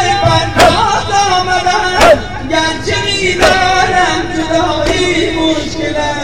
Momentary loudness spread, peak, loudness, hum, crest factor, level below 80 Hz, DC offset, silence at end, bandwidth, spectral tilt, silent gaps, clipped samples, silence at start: 6 LU; 0 dBFS; -11 LUFS; none; 12 dB; -28 dBFS; 3%; 0 s; 18 kHz; -3.5 dB/octave; none; under 0.1%; 0 s